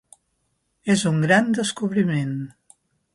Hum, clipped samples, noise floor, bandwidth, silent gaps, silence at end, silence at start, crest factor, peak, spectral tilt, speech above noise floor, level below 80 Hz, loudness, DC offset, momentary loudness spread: none; under 0.1%; -71 dBFS; 11.5 kHz; none; 0.65 s; 0.85 s; 18 dB; -4 dBFS; -5.5 dB/octave; 51 dB; -64 dBFS; -21 LUFS; under 0.1%; 14 LU